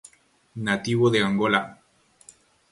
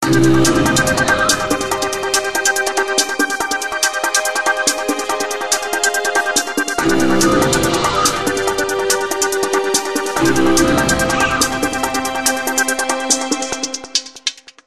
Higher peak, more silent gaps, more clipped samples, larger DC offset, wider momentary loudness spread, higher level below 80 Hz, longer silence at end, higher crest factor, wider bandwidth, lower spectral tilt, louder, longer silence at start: second, -4 dBFS vs 0 dBFS; neither; neither; neither; first, 16 LU vs 6 LU; second, -60 dBFS vs -38 dBFS; first, 1 s vs 0.3 s; first, 22 dB vs 16 dB; second, 11.5 kHz vs 13 kHz; first, -5.5 dB/octave vs -2.5 dB/octave; second, -23 LUFS vs -16 LUFS; first, 0.55 s vs 0 s